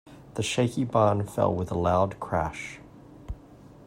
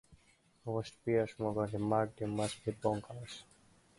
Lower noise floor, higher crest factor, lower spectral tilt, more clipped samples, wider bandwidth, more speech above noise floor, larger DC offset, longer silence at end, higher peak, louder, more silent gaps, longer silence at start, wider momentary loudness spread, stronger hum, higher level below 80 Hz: second, -50 dBFS vs -69 dBFS; about the same, 20 dB vs 20 dB; about the same, -6 dB/octave vs -6.5 dB/octave; neither; first, 16 kHz vs 11.5 kHz; second, 24 dB vs 33 dB; neither; second, 0 s vs 0.55 s; first, -8 dBFS vs -18 dBFS; first, -26 LUFS vs -37 LUFS; neither; about the same, 0.05 s vs 0.1 s; first, 20 LU vs 14 LU; neither; first, -50 dBFS vs -64 dBFS